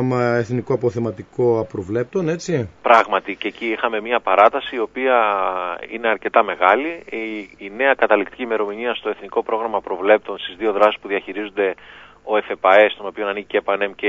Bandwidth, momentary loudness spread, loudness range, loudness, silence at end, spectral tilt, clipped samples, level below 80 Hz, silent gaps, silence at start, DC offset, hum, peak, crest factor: 7.8 kHz; 12 LU; 3 LU; -19 LUFS; 0 s; -6 dB/octave; under 0.1%; -60 dBFS; none; 0 s; under 0.1%; 50 Hz at -60 dBFS; 0 dBFS; 20 dB